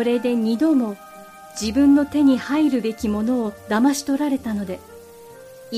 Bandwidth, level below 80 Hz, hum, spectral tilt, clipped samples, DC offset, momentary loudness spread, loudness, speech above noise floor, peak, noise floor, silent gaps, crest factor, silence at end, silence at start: 15 kHz; -50 dBFS; none; -5 dB/octave; under 0.1%; under 0.1%; 12 LU; -20 LUFS; 23 dB; -6 dBFS; -42 dBFS; none; 14 dB; 0 s; 0 s